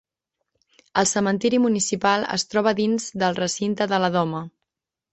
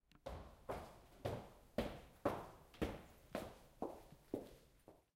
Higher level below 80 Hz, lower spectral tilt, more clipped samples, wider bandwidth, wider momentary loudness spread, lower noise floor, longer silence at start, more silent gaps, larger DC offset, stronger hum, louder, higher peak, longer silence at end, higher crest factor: about the same, -62 dBFS vs -62 dBFS; second, -4 dB/octave vs -6 dB/octave; neither; second, 8.4 kHz vs 16 kHz; second, 5 LU vs 15 LU; first, -82 dBFS vs -68 dBFS; first, 0.95 s vs 0.15 s; neither; neither; neither; first, -22 LUFS vs -50 LUFS; first, -4 dBFS vs -24 dBFS; first, 0.65 s vs 0.15 s; second, 20 dB vs 26 dB